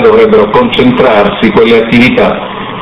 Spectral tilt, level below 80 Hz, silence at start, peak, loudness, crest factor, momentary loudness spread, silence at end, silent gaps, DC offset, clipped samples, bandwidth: -7 dB/octave; -32 dBFS; 0 s; 0 dBFS; -6 LUFS; 6 dB; 5 LU; 0 s; none; under 0.1%; 4%; 8.6 kHz